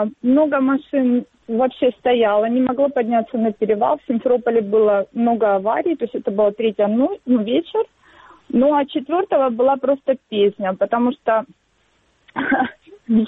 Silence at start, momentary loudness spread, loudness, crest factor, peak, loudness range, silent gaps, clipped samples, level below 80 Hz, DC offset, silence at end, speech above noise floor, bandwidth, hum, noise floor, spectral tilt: 0 s; 6 LU; -19 LUFS; 12 dB; -6 dBFS; 2 LU; none; under 0.1%; -60 dBFS; under 0.1%; 0 s; 44 dB; 4 kHz; none; -62 dBFS; -9 dB/octave